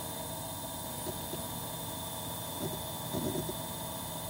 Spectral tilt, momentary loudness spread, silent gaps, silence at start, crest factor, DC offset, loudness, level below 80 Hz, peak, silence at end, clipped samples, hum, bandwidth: -3.5 dB/octave; 3 LU; none; 0 s; 18 dB; under 0.1%; -37 LUFS; -58 dBFS; -20 dBFS; 0 s; under 0.1%; none; 17 kHz